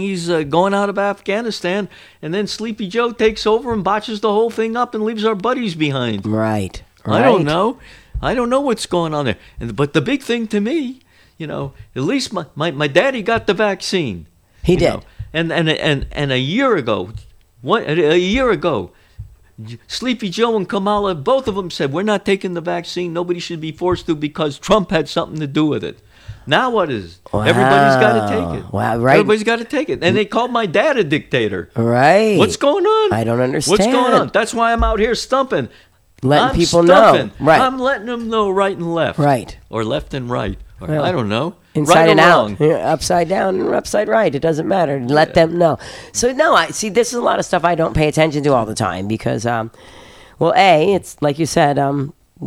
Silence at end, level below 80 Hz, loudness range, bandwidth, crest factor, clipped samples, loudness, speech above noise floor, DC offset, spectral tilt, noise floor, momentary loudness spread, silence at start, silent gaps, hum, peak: 0 s; -38 dBFS; 5 LU; 16 kHz; 16 dB; under 0.1%; -16 LUFS; 21 dB; under 0.1%; -5 dB/octave; -37 dBFS; 11 LU; 0 s; none; none; 0 dBFS